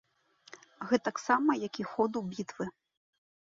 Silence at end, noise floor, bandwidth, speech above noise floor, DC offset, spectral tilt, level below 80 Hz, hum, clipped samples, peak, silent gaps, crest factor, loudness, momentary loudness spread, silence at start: 0.75 s; -57 dBFS; 7.8 kHz; 26 dB; under 0.1%; -5 dB/octave; -74 dBFS; none; under 0.1%; -12 dBFS; none; 22 dB; -32 LUFS; 13 LU; 0.5 s